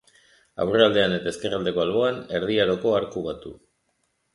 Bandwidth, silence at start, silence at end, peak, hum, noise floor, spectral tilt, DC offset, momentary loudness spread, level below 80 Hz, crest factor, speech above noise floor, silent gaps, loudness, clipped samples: 11.5 kHz; 0.6 s; 0.8 s; -2 dBFS; none; -72 dBFS; -5.5 dB/octave; under 0.1%; 14 LU; -56 dBFS; 22 dB; 49 dB; none; -23 LUFS; under 0.1%